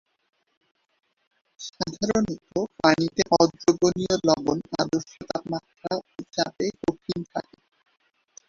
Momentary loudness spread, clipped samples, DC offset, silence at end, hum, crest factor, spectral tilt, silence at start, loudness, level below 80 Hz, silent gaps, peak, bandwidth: 12 LU; under 0.1%; under 0.1%; 1.05 s; none; 24 dB; -4.5 dB/octave; 1.6 s; -25 LUFS; -58 dBFS; none; -2 dBFS; 7.6 kHz